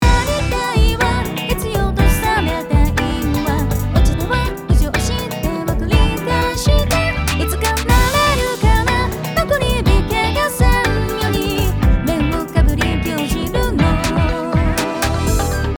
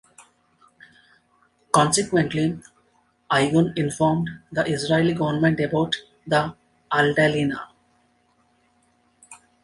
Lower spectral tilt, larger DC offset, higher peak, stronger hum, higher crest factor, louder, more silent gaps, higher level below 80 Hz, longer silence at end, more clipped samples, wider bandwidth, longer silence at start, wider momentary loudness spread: about the same, -5 dB/octave vs -5 dB/octave; neither; about the same, 0 dBFS vs -2 dBFS; neither; second, 16 dB vs 22 dB; first, -17 LUFS vs -22 LUFS; neither; first, -20 dBFS vs -56 dBFS; second, 0 s vs 0.3 s; neither; first, over 20 kHz vs 11.5 kHz; second, 0 s vs 0.2 s; second, 4 LU vs 9 LU